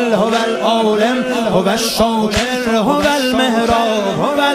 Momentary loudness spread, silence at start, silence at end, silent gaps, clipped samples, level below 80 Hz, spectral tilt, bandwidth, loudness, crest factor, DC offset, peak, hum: 2 LU; 0 s; 0 s; none; under 0.1%; -40 dBFS; -4 dB/octave; 15.5 kHz; -14 LUFS; 14 dB; under 0.1%; -2 dBFS; none